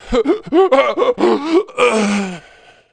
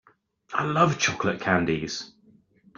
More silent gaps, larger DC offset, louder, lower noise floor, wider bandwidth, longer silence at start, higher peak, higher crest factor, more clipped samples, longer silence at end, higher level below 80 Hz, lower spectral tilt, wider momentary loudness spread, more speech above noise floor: neither; neither; first, -15 LUFS vs -25 LUFS; second, -45 dBFS vs -59 dBFS; first, 10 kHz vs 7.4 kHz; second, 0.05 s vs 0.5 s; first, 0 dBFS vs -6 dBFS; second, 14 dB vs 22 dB; neither; second, 0.55 s vs 0.7 s; first, -40 dBFS vs -58 dBFS; about the same, -5 dB/octave vs -4.5 dB/octave; second, 7 LU vs 12 LU; second, 31 dB vs 35 dB